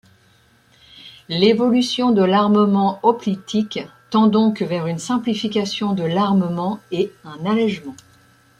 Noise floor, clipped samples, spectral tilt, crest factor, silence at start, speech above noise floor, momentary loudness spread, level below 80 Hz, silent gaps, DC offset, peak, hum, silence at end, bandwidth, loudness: -55 dBFS; under 0.1%; -6 dB/octave; 16 dB; 1.05 s; 37 dB; 10 LU; -62 dBFS; none; under 0.1%; -2 dBFS; none; 0.65 s; 11 kHz; -19 LUFS